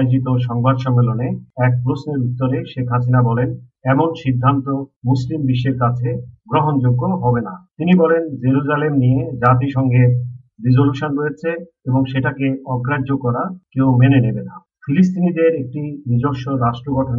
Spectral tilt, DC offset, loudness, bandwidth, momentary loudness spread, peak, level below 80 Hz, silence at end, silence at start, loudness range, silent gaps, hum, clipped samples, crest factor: -8 dB/octave; under 0.1%; -17 LUFS; 5.6 kHz; 9 LU; 0 dBFS; -48 dBFS; 0 s; 0 s; 3 LU; 4.96-5.01 s; none; under 0.1%; 16 dB